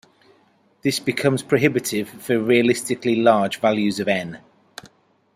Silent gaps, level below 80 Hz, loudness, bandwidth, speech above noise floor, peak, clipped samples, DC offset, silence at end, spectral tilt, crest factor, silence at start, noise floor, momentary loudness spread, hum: none; -62 dBFS; -20 LUFS; 16 kHz; 39 dB; -2 dBFS; under 0.1%; under 0.1%; 0.5 s; -5 dB/octave; 20 dB; 0.85 s; -59 dBFS; 10 LU; none